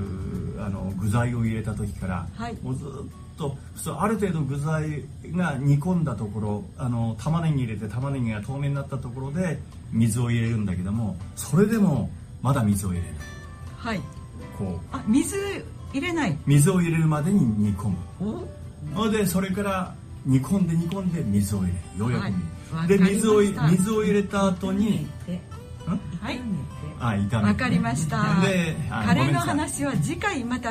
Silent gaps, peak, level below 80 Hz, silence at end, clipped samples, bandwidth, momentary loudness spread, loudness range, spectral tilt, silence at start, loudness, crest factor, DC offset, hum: none; -8 dBFS; -44 dBFS; 0 s; under 0.1%; 15.5 kHz; 12 LU; 6 LU; -6.5 dB/octave; 0 s; -25 LUFS; 18 dB; under 0.1%; none